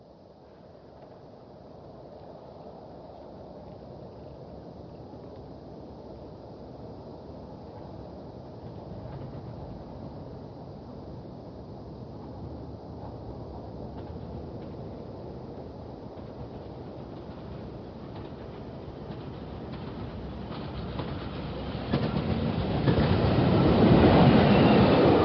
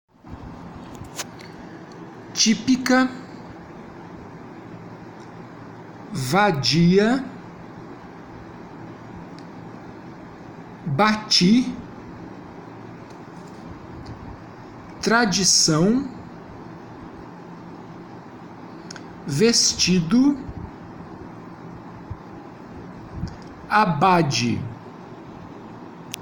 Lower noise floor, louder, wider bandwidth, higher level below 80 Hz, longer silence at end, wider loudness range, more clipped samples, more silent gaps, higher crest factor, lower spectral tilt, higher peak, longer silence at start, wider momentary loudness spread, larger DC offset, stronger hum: first, -52 dBFS vs -40 dBFS; second, -25 LUFS vs -19 LUFS; second, 6 kHz vs 17 kHz; first, -44 dBFS vs -50 dBFS; about the same, 0 s vs 0 s; first, 20 LU vs 15 LU; neither; neither; about the same, 22 dB vs 20 dB; first, -6.5 dB/octave vs -4 dB/octave; second, -8 dBFS vs -4 dBFS; second, 0 s vs 0.25 s; about the same, 25 LU vs 23 LU; neither; neither